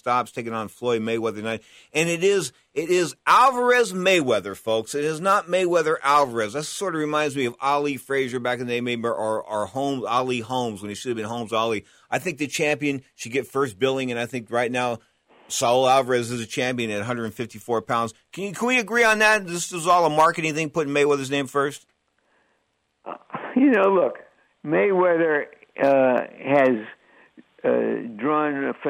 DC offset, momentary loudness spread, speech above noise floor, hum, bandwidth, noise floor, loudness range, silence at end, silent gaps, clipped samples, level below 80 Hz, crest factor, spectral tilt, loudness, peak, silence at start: under 0.1%; 11 LU; 49 dB; none; 16 kHz; -71 dBFS; 5 LU; 0 s; none; under 0.1%; -66 dBFS; 16 dB; -4 dB/octave; -22 LUFS; -6 dBFS; 0.05 s